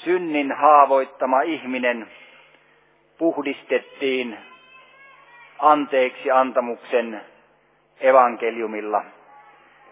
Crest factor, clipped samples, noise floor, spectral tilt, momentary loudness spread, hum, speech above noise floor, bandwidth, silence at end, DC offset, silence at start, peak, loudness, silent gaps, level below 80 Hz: 20 dB; under 0.1%; -60 dBFS; -8 dB/octave; 13 LU; none; 40 dB; 3.9 kHz; 0.85 s; under 0.1%; 0 s; 0 dBFS; -20 LUFS; none; -82 dBFS